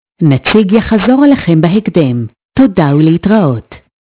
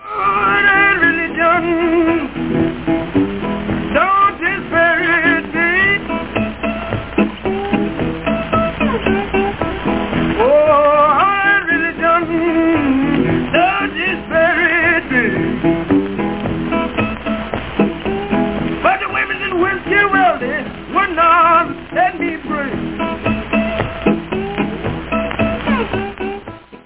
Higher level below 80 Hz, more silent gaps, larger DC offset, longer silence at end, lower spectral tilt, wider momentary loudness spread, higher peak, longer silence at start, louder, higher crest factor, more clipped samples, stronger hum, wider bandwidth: about the same, -36 dBFS vs -36 dBFS; first, 2.45-2.49 s vs none; second, under 0.1% vs 0.6%; first, 0.25 s vs 0.05 s; first, -12 dB/octave vs -9.5 dB/octave; about the same, 7 LU vs 9 LU; about the same, 0 dBFS vs -2 dBFS; first, 0.2 s vs 0 s; first, -10 LUFS vs -15 LUFS; about the same, 10 dB vs 14 dB; first, 2% vs under 0.1%; neither; about the same, 4 kHz vs 4 kHz